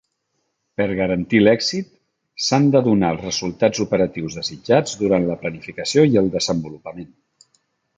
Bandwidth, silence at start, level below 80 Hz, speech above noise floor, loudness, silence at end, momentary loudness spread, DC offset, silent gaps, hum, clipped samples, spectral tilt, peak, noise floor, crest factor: 9.4 kHz; 0.8 s; -50 dBFS; 54 dB; -19 LUFS; 0.9 s; 16 LU; under 0.1%; none; none; under 0.1%; -5 dB/octave; -2 dBFS; -72 dBFS; 18 dB